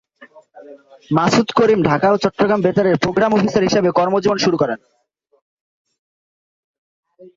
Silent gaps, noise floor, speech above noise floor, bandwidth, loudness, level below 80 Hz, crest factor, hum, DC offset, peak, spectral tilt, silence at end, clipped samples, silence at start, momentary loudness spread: 5.42-5.85 s, 5.99-7.03 s; -46 dBFS; 31 dB; 7.8 kHz; -16 LUFS; -52 dBFS; 16 dB; none; under 0.1%; -2 dBFS; -6 dB/octave; 0.1 s; under 0.1%; 0.2 s; 4 LU